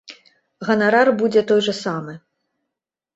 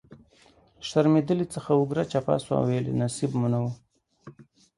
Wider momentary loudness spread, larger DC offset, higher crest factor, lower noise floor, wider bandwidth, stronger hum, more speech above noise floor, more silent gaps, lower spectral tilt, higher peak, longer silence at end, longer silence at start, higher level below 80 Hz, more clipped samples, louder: first, 14 LU vs 7 LU; neither; about the same, 18 dB vs 20 dB; first, -83 dBFS vs -59 dBFS; second, 8 kHz vs 11.5 kHz; neither; first, 66 dB vs 34 dB; neither; second, -5 dB/octave vs -7 dB/octave; first, -2 dBFS vs -8 dBFS; first, 0.95 s vs 0.35 s; about the same, 0.1 s vs 0.1 s; about the same, -64 dBFS vs -60 dBFS; neither; first, -18 LUFS vs -26 LUFS